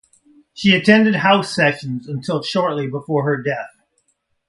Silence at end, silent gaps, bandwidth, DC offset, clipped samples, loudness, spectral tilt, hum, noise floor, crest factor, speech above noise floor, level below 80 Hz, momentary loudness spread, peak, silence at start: 0.8 s; none; 11.5 kHz; under 0.1%; under 0.1%; -17 LUFS; -5.5 dB/octave; none; -66 dBFS; 18 dB; 49 dB; -58 dBFS; 14 LU; 0 dBFS; 0.55 s